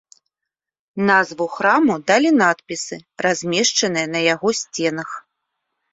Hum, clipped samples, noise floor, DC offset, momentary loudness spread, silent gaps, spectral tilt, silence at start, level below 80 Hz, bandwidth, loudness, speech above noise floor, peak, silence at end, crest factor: none; under 0.1%; -84 dBFS; under 0.1%; 13 LU; none; -3 dB/octave; 0.95 s; -66 dBFS; 8.2 kHz; -18 LUFS; 66 dB; -2 dBFS; 0.7 s; 18 dB